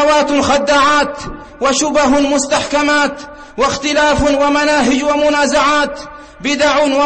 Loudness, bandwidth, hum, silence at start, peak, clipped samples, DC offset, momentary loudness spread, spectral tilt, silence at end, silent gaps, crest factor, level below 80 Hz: -13 LUFS; 8.8 kHz; none; 0 s; -2 dBFS; under 0.1%; 0.4%; 10 LU; -3 dB/octave; 0 s; none; 10 dB; -36 dBFS